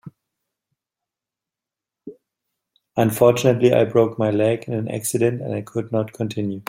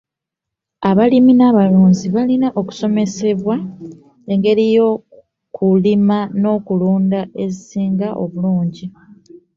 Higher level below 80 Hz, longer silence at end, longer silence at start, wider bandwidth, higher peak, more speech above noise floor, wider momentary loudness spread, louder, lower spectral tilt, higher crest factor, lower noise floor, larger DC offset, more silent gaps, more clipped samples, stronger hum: about the same, -60 dBFS vs -56 dBFS; second, 0.05 s vs 0.7 s; second, 0.05 s vs 0.8 s; first, 16.5 kHz vs 7.4 kHz; about the same, -2 dBFS vs 0 dBFS; about the same, 69 dB vs 68 dB; second, 10 LU vs 13 LU; second, -20 LUFS vs -15 LUFS; second, -6 dB/octave vs -8 dB/octave; first, 20 dB vs 14 dB; first, -88 dBFS vs -82 dBFS; neither; neither; neither; neither